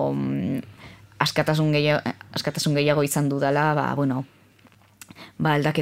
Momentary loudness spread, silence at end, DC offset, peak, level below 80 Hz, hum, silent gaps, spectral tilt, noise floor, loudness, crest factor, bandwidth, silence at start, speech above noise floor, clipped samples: 10 LU; 0 s; under 0.1%; -2 dBFS; -62 dBFS; none; none; -5.5 dB/octave; -55 dBFS; -23 LUFS; 22 dB; 16 kHz; 0 s; 33 dB; under 0.1%